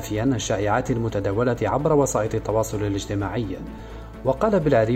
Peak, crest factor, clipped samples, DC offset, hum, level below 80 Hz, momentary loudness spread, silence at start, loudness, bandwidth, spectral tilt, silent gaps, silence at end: -6 dBFS; 16 dB; under 0.1%; under 0.1%; none; -40 dBFS; 10 LU; 0 s; -23 LUFS; 16 kHz; -6 dB/octave; none; 0 s